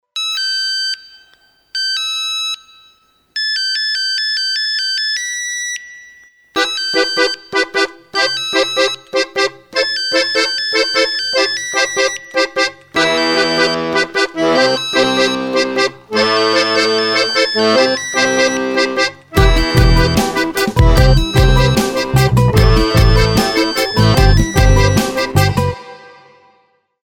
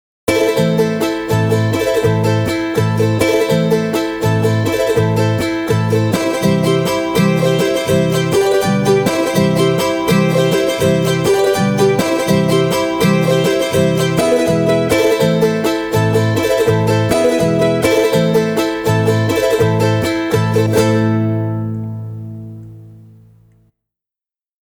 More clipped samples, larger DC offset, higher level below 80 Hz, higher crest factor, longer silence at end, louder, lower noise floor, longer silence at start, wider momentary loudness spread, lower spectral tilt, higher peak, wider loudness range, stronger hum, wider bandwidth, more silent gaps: neither; neither; first, -22 dBFS vs -44 dBFS; about the same, 14 dB vs 14 dB; second, 1 s vs 1.7 s; about the same, -14 LUFS vs -14 LUFS; second, -57 dBFS vs under -90 dBFS; about the same, 0.15 s vs 0.25 s; first, 6 LU vs 3 LU; second, -4 dB/octave vs -6 dB/octave; about the same, 0 dBFS vs 0 dBFS; first, 5 LU vs 2 LU; neither; second, 18 kHz vs 20 kHz; neither